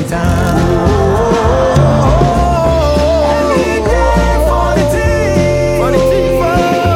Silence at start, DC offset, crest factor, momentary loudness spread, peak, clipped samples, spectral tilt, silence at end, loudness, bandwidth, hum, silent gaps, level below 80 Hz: 0 s; under 0.1%; 10 dB; 2 LU; 0 dBFS; under 0.1%; -6.5 dB/octave; 0 s; -11 LUFS; 16.5 kHz; none; none; -18 dBFS